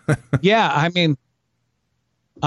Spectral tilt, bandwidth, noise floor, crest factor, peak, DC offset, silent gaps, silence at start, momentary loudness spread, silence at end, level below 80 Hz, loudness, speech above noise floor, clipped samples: -6 dB/octave; 11.5 kHz; -71 dBFS; 16 dB; -4 dBFS; under 0.1%; none; 0.1 s; 6 LU; 0 s; -54 dBFS; -18 LUFS; 53 dB; under 0.1%